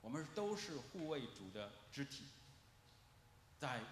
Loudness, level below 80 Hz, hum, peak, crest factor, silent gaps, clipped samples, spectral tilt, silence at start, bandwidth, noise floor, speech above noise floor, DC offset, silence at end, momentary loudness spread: -48 LUFS; -76 dBFS; none; -30 dBFS; 20 dB; none; under 0.1%; -4.5 dB/octave; 0 s; 13.5 kHz; -68 dBFS; 19 dB; under 0.1%; 0 s; 23 LU